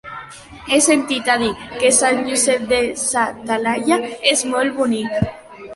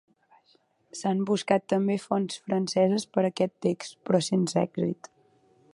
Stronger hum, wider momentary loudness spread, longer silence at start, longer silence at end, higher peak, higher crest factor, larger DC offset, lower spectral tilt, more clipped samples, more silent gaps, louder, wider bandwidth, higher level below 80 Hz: neither; first, 10 LU vs 7 LU; second, 0.05 s vs 0.95 s; second, 0 s vs 0.8 s; first, -2 dBFS vs -8 dBFS; about the same, 16 dB vs 20 dB; neither; second, -2.5 dB/octave vs -6 dB/octave; neither; neither; first, -17 LUFS vs -27 LUFS; about the same, 12 kHz vs 11.5 kHz; first, -48 dBFS vs -72 dBFS